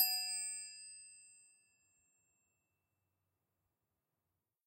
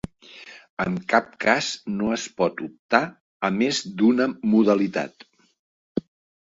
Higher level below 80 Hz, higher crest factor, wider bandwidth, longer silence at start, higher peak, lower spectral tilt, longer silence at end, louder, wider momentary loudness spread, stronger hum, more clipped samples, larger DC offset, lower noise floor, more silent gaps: second, under -90 dBFS vs -60 dBFS; about the same, 28 dB vs 24 dB; first, 16 kHz vs 7.8 kHz; second, 0 s vs 0.35 s; second, -18 dBFS vs 0 dBFS; second, 5 dB/octave vs -5 dB/octave; first, 3.3 s vs 0.5 s; second, -38 LUFS vs -23 LUFS; first, 23 LU vs 15 LU; neither; neither; neither; first, -90 dBFS vs -46 dBFS; second, none vs 0.70-0.77 s, 2.79-2.89 s, 3.21-3.40 s, 5.59-5.95 s